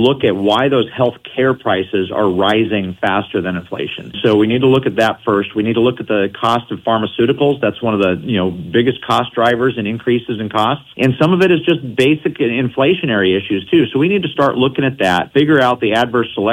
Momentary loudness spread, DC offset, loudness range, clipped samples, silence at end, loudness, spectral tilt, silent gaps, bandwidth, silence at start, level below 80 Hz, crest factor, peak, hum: 5 LU; under 0.1%; 2 LU; under 0.1%; 0 s; -15 LUFS; -7 dB/octave; none; 15 kHz; 0 s; -52 dBFS; 14 dB; 0 dBFS; none